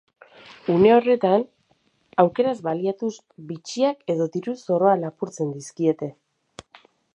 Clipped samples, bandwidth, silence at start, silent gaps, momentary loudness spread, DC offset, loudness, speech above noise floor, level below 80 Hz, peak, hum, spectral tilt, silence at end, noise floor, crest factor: under 0.1%; 10.5 kHz; 0.65 s; none; 15 LU; under 0.1%; -22 LUFS; 44 dB; -66 dBFS; -2 dBFS; none; -6.5 dB/octave; 1.05 s; -65 dBFS; 22 dB